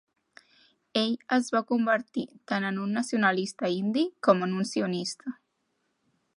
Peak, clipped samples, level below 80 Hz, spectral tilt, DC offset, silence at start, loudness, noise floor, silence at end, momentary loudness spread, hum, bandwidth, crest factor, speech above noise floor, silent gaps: -6 dBFS; under 0.1%; -80 dBFS; -5 dB/octave; under 0.1%; 0.95 s; -28 LUFS; -76 dBFS; 1.05 s; 10 LU; none; 11.5 kHz; 22 dB; 49 dB; none